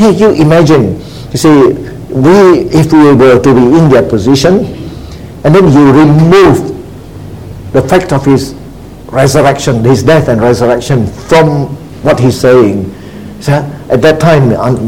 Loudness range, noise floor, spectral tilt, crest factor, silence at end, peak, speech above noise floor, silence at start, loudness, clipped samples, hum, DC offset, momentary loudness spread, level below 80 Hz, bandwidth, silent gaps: 4 LU; -27 dBFS; -7 dB/octave; 6 dB; 0 s; 0 dBFS; 21 dB; 0 s; -6 LUFS; 3%; none; 1%; 18 LU; -30 dBFS; 16.5 kHz; none